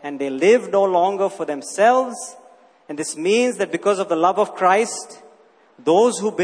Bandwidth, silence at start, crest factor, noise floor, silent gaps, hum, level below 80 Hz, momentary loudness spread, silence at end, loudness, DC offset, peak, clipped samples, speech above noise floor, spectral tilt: 11 kHz; 0.05 s; 18 dB; -52 dBFS; none; none; -72 dBFS; 12 LU; 0 s; -19 LUFS; under 0.1%; -2 dBFS; under 0.1%; 34 dB; -4 dB/octave